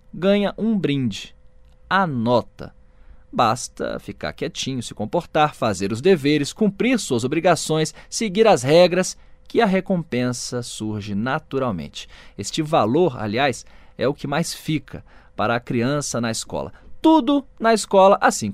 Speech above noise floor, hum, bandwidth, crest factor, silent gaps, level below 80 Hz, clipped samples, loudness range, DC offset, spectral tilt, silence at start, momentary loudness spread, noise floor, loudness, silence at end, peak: 28 dB; none; 15.5 kHz; 18 dB; none; -48 dBFS; under 0.1%; 5 LU; 0.2%; -5 dB/octave; 0.15 s; 14 LU; -48 dBFS; -20 LUFS; 0 s; -2 dBFS